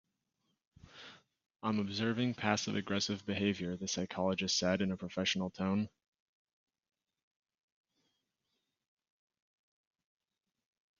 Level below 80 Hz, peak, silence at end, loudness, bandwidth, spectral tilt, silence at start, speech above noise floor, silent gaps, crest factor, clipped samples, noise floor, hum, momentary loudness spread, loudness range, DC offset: -74 dBFS; -14 dBFS; 5.1 s; -35 LUFS; 7.4 kHz; -4 dB/octave; 0.95 s; 51 dB; none; 26 dB; under 0.1%; -86 dBFS; none; 10 LU; 7 LU; under 0.1%